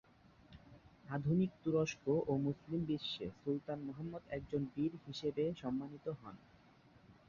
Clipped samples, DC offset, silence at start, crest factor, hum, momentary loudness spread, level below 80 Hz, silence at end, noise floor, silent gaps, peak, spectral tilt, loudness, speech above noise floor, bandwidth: under 0.1%; under 0.1%; 0.5 s; 18 dB; none; 12 LU; -68 dBFS; 0.15 s; -65 dBFS; none; -22 dBFS; -6.5 dB/octave; -40 LUFS; 26 dB; 7.2 kHz